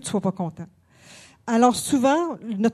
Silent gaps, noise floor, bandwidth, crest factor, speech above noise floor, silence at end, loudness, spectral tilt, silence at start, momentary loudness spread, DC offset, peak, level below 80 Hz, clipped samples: none; -49 dBFS; 13.5 kHz; 20 dB; 27 dB; 0 s; -22 LUFS; -5 dB/octave; 0.05 s; 19 LU; under 0.1%; -4 dBFS; -62 dBFS; under 0.1%